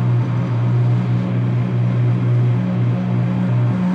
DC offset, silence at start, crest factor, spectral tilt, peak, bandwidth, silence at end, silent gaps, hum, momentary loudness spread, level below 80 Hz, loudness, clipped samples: under 0.1%; 0 s; 8 dB; -10 dB/octave; -8 dBFS; 4.8 kHz; 0 s; none; none; 2 LU; -52 dBFS; -18 LUFS; under 0.1%